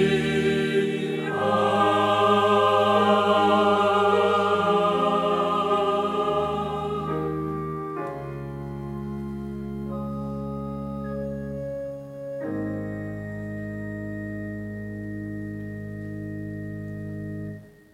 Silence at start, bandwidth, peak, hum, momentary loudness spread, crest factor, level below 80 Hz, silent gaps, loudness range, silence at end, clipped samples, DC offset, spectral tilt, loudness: 0 s; 13.5 kHz; -6 dBFS; none; 15 LU; 18 dB; -50 dBFS; none; 14 LU; 0.25 s; under 0.1%; under 0.1%; -6.5 dB/octave; -25 LUFS